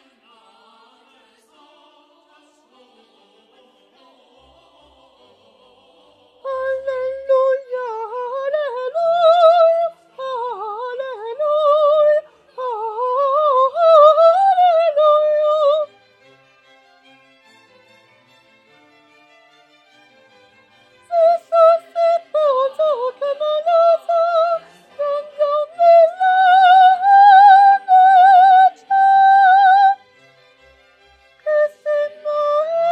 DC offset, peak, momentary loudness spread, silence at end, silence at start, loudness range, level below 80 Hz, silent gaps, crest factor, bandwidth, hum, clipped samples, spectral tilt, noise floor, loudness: under 0.1%; 0 dBFS; 16 LU; 0 s; 6.45 s; 13 LU; -72 dBFS; none; 16 dB; 8 kHz; none; under 0.1%; -1.5 dB/octave; -55 dBFS; -14 LUFS